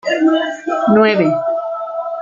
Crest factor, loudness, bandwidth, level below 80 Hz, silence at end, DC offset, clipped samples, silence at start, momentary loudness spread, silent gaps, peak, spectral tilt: 14 dB; -15 LUFS; 7.4 kHz; -60 dBFS; 0 s; under 0.1%; under 0.1%; 0.05 s; 11 LU; none; -2 dBFS; -6.5 dB/octave